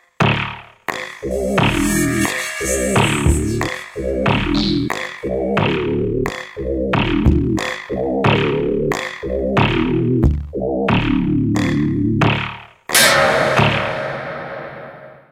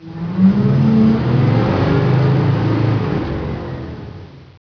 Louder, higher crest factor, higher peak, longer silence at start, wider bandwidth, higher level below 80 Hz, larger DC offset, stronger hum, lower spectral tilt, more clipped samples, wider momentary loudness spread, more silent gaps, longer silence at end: second, -18 LUFS vs -15 LUFS; first, 18 dB vs 12 dB; about the same, 0 dBFS vs -2 dBFS; first, 0.2 s vs 0 s; first, 16.5 kHz vs 5.4 kHz; first, -30 dBFS vs -36 dBFS; neither; neither; second, -5 dB/octave vs -9.5 dB/octave; neither; second, 11 LU vs 15 LU; neither; about the same, 0.2 s vs 0.25 s